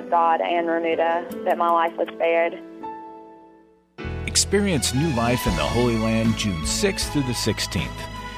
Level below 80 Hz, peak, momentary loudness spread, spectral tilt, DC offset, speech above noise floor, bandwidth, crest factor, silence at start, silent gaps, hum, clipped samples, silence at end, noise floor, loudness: -38 dBFS; -6 dBFS; 14 LU; -4 dB/octave; under 0.1%; 32 dB; 15.5 kHz; 18 dB; 0 s; none; none; under 0.1%; 0 s; -53 dBFS; -22 LUFS